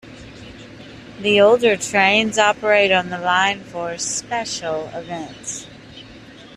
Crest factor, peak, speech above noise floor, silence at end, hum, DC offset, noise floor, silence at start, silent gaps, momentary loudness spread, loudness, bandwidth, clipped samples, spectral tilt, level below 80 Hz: 18 dB; -2 dBFS; 23 dB; 0 s; none; under 0.1%; -41 dBFS; 0.05 s; none; 24 LU; -17 LUFS; 13.5 kHz; under 0.1%; -2.5 dB/octave; -54 dBFS